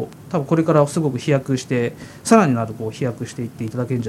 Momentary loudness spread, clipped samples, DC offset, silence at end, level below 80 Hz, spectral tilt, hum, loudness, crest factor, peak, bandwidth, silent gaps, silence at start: 12 LU; under 0.1%; under 0.1%; 0 s; -56 dBFS; -6.5 dB/octave; none; -20 LUFS; 18 dB; 0 dBFS; 15.5 kHz; none; 0 s